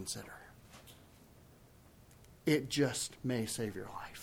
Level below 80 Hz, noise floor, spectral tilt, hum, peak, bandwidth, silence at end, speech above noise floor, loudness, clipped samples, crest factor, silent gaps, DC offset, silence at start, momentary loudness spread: -66 dBFS; -61 dBFS; -4.5 dB/octave; none; -18 dBFS; 18.5 kHz; 0 s; 24 dB; -36 LUFS; under 0.1%; 20 dB; none; under 0.1%; 0 s; 23 LU